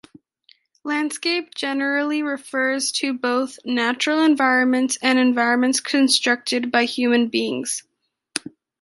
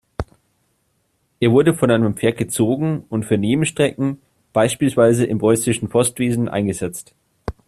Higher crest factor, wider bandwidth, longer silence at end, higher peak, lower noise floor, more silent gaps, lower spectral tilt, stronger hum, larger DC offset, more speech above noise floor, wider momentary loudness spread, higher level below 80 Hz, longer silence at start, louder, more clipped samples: about the same, 20 dB vs 16 dB; second, 11.5 kHz vs 14.5 kHz; first, 0.45 s vs 0.15 s; about the same, -2 dBFS vs -2 dBFS; second, -58 dBFS vs -66 dBFS; neither; second, -1.5 dB/octave vs -5.5 dB/octave; neither; neither; second, 38 dB vs 49 dB; second, 9 LU vs 16 LU; second, -72 dBFS vs -46 dBFS; first, 0.85 s vs 0.2 s; about the same, -20 LUFS vs -18 LUFS; neither